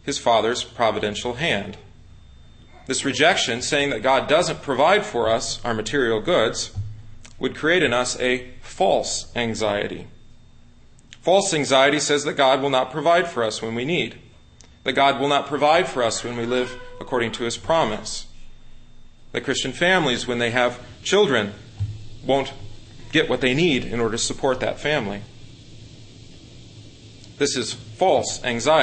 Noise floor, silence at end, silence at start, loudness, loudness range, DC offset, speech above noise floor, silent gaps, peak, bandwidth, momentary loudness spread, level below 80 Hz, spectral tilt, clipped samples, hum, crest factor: -48 dBFS; 0 s; 0.05 s; -21 LUFS; 6 LU; under 0.1%; 27 dB; none; -2 dBFS; 8.8 kHz; 12 LU; -44 dBFS; -3.5 dB/octave; under 0.1%; none; 20 dB